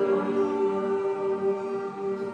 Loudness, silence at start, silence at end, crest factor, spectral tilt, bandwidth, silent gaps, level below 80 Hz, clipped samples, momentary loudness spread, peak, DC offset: -27 LUFS; 0 s; 0 s; 12 dB; -7.5 dB/octave; 8.4 kHz; none; -76 dBFS; under 0.1%; 6 LU; -14 dBFS; under 0.1%